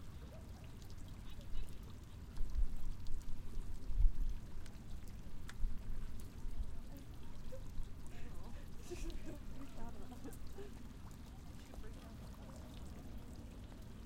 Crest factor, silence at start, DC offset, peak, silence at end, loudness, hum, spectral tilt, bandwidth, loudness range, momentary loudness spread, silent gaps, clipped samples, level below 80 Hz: 22 dB; 0 s; under 0.1%; -18 dBFS; 0 s; -51 LUFS; none; -6 dB/octave; 10 kHz; 7 LU; 8 LU; none; under 0.1%; -44 dBFS